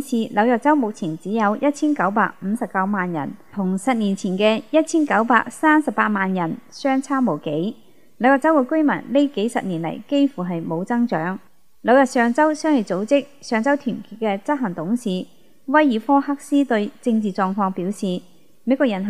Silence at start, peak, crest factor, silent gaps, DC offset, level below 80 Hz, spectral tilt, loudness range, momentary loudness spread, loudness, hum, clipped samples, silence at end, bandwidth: 0 s; 0 dBFS; 20 dB; none; 0.5%; -70 dBFS; -6 dB/octave; 2 LU; 10 LU; -20 LUFS; none; under 0.1%; 0 s; 13.5 kHz